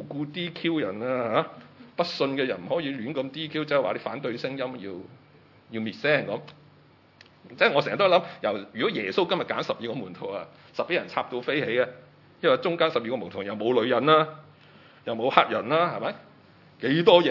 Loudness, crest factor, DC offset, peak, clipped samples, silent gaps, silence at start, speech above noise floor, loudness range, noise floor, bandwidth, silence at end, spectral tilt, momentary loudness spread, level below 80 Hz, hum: -26 LUFS; 26 dB; under 0.1%; 0 dBFS; under 0.1%; none; 0 s; 31 dB; 6 LU; -56 dBFS; 6 kHz; 0 s; -6.5 dB/octave; 13 LU; -76 dBFS; none